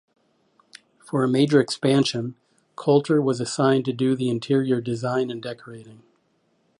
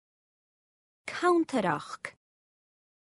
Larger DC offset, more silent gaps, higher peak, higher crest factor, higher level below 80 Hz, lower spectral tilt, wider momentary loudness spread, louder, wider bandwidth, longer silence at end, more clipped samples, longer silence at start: neither; neither; first, -6 dBFS vs -12 dBFS; about the same, 18 dB vs 20 dB; first, -68 dBFS vs -76 dBFS; about the same, -6 dB/octave vs -5.5 dB/octave; about the same, 15 LU vs 17 LU; first, -22 LUFS vs -29 LUFS; about the same, 11 kHz vs 11.5 kHz; second, 0.85 s vs 1.05 s; neither; about the same, 1.15 s vs 1.05 s